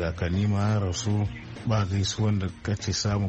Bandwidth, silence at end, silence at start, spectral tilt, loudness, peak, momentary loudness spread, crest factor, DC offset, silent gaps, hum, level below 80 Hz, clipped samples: 8.4 kHz; 0 s; 0 s; -5.5 dB/octave; -27 LUFS; -14 dBFS; 6 LU; 12 dB; under 0.1%; none; none; -44 dBFS; under 0.1%